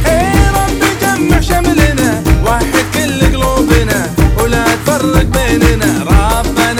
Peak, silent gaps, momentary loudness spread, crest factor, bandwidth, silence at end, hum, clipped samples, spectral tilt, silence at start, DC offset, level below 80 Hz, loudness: 0 dBFS; none; 2 LU; 10 dB; 17.5 kHz; 0 s; none; 0.2%; -5 dB/octave; 0 s; under 0.1%; -16 dBFS; -11 LUFS